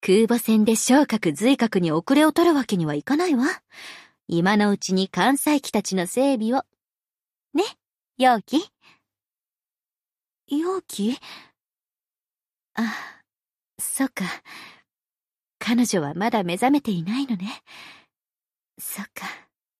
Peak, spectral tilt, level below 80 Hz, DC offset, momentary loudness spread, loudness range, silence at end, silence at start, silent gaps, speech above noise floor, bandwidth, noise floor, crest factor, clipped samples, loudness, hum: -4 dBFS; -4.5 dB/octave; -68 dBFS; under 0.1%; 17 LU; 11 LU; 0.4 s; 0 s; none; over 68 dB; 15 kHz; under -90 dBFS; 18 dB; under 0.1%; -22 LUFS; none